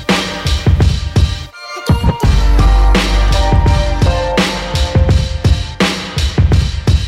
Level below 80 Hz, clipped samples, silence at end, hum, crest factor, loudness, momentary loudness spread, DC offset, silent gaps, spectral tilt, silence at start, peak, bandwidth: -14 dBFS; under 0.1%; 0 s; none; 12 dB; -13 LUFS; 5 LU; under 0.1%; none; -5.5 dB/octave; 0 s; 0 dBFS; 13.5 kHz